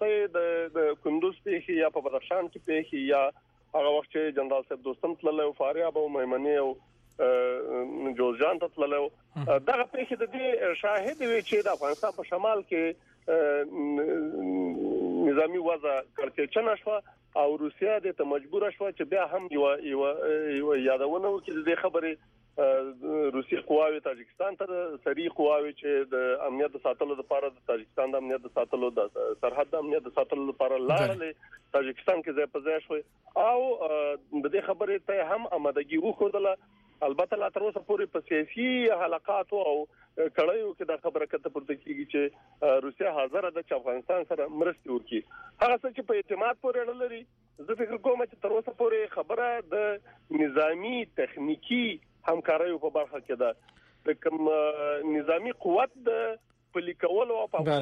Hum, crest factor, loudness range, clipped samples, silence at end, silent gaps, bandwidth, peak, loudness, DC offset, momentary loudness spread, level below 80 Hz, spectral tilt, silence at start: none; 14 dB; 2 LU; under 0.1%; 0 s; none; 8 kHz; -16 dBFS; -29 LUFS; under 0.1%; 7 LU; -70 dBFS; -6.5 dB/octave; 0 s